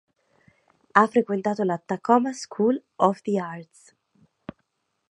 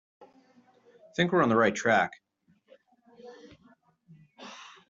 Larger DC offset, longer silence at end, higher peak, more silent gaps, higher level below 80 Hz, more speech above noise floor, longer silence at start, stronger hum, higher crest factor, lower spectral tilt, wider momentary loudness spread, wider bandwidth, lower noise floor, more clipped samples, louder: neither; first, 1.5 s vs 0.25 s; first, -2 dBFS vs -10 dBFS; neither; about the same, -72 dBFS vs -70 dBFS; first, 51 dB vs 43 dB; second, 0.95 s vs 1.2 s; neither; about the same, 24 dB vs 22 dB; first, -6 dB/octave vs -4 dB/octave; second, 23 LU vs 26 LU; first, 11 kHz vs 7.8 kHz; first, -74 dBFS vs -68 dBFS; neither; first, -23 LUFS vs -26 LUFS